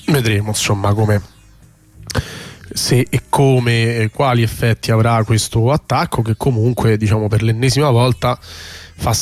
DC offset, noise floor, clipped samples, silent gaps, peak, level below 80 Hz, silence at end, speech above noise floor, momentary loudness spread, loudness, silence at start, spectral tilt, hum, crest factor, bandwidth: under 0.1%; -46 dBFS; under 0.1%; none; -4 dBFS; -38 dBFS; 0 s; 31 dB; 10 LU; -16 LUFS; 0.05 s; -5.5 dB/octave; none; 12 dB; 15 kHz